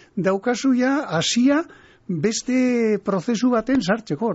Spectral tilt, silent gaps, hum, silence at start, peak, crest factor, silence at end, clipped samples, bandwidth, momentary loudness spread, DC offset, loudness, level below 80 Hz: -4.5 dB/octave; none; none; 0.15 s; -8 dBFS; 12 dB; 0 s; under 0.1%; 8 kHz; 5 LU; under 0.1%; -21 LUFS; -56 dBFS